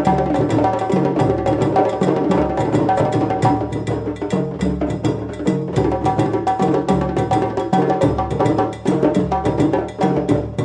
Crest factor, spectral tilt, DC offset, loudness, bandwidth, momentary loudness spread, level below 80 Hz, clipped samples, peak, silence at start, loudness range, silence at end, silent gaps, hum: 16 dB; -8 dB/octave; under 0.1%; -18 LUFS; 11 kHz; 5 LU; -36 dBFS; under 0.1%; -2 dBFS; 0 s; 3 LU; 0 s; none; none